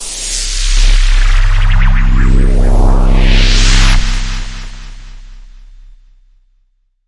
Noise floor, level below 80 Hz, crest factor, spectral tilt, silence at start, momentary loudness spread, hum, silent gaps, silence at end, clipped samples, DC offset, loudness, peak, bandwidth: -56 dBFS; -10 dBFS; 10 dB; -3.5 dB/octave; 0 s; 14 LU; none; none; 1.65 s; under 0.1%; under 0.1%; -13 LUFS; 0 dBFS; 11 kHz